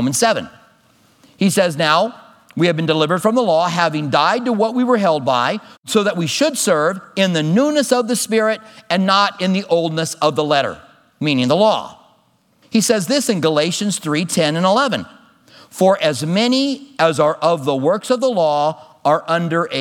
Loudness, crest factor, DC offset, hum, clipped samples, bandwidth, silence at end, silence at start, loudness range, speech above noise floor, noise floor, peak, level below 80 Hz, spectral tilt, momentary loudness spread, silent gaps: -17 LUFS; 16 dB; under 0.1%; none; under 0.1%; 18 kHz; 0 s; 0 s; 2 LU; 41 dB; -58 dBFS; 0 dBFS; -68 dBFS; -4.5 dB/octave; 6 LU; 5.78-5.83 s